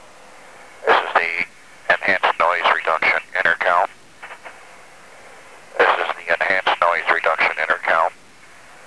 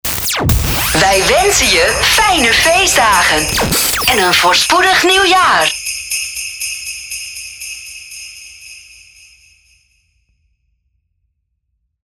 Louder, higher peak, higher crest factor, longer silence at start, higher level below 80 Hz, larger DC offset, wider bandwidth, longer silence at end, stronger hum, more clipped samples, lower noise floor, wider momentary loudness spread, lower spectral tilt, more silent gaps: second, -18 LUFS vs -10 LUFS; about the same, -2 dBFS vs 0 dBFS; about the same, 18 dB vs 14 dB; first, 0.6 s vs 0.05 s; second, -64 dBFS vs -30 dBFS; first, 0.4% vs under 0.1%; second, 11 kHz vs over 20 kHz; second, 0.75 s vs 3.25 s; neither; neither; second, -47 dBFS vs -68 dBFS; second, 13 LU vs 17 LU; about the same, -2.5 dB/octave vs -2 dB/octave; neither